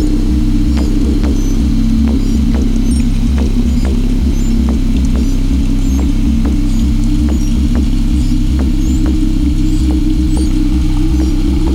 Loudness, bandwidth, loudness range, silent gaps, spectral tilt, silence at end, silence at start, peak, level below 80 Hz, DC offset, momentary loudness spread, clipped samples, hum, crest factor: -14 LUFS; 12 kHz; 1 LU; none; -7 dB/octave; 0 s; 0 s; -2 dBFS; -12 dBFS; under 0.1%; 1 LU; under 0.1%; none; 10 dB